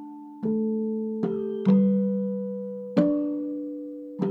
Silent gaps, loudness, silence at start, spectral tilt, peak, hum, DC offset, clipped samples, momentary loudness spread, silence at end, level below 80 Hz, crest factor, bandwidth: none; -26 LUFS; 0 s; -11 dB/octave; -8 dBFS; none; under 0.1%; under 0.1%; 13 LU; 0 s; -68 dBFS; 18 dB; 4.7 kHz